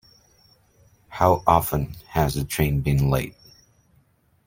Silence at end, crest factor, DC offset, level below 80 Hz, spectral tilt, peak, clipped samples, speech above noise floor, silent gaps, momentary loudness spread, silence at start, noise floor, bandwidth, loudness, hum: 1.15 s; 22 dB; under 0.1%; -38 dBFS; -6.5 dB/octave; -2 dBFS; under 0.1%; 41 dB; none; 9 LU; 1.1 s; -62 dBFS; 16.5 kHz; -22 LUFS; none